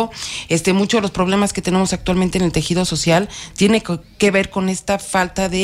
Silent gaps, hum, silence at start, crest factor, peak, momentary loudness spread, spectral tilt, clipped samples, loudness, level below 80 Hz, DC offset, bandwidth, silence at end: none; none; 0 s; 16 dB; -2 dBFS; 5 LU; -4.5 dB/octave; under 0.1%; -18 LUFS; -38 dBFS; under 0.1%; 15 kHz; 0 s